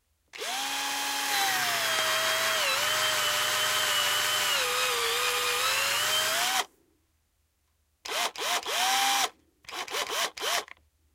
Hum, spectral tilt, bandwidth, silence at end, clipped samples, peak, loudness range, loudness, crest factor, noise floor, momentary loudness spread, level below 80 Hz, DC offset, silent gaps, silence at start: none; 1 dB/octave; 16 kHz; 0.5 s; under 0.1%; -12 dBFS; 4 LU; -26 LUFS; 16 dB; -73 dBFS; 7 LU; -70 dBFS; under 0.1%; none; 0.35 s